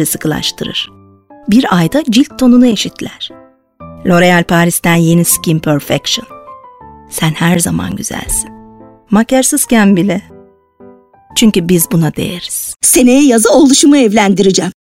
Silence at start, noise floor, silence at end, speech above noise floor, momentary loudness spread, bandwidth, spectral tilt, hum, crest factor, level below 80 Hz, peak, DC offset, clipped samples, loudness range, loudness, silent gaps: 0 s; -40 dBFS; 0.15 s; 30 dB; 12 LU; 17 kHz; -4.5 dB/octave; none; 12 dB; -38 dBFS; 0 dBFS; under 0.1%; under 0.1%; 6 LU; -10 LUFS; none